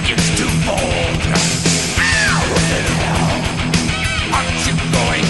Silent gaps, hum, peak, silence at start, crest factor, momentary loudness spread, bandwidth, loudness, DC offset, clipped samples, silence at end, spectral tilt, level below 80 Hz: none; none; 0 dBFS; 0 s; 16 dB; 3 LU; 12 kHz; -15 LUFS; 0.8%; under 0.1%; 0 s; -3.5 dB/octave; -28 dBFS